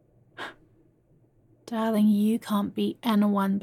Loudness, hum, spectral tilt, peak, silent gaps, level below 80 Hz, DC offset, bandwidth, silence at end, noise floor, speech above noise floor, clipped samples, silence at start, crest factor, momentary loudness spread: -25 LUFS; none; -7 dB/octave; -12 dBFS; none; -72 dBFS; under 0.1%; 14.5 kHz; 0 s; -62 dBFS; 38 dB; under 0.1%; 0.4 s; 16 dB; 18 LU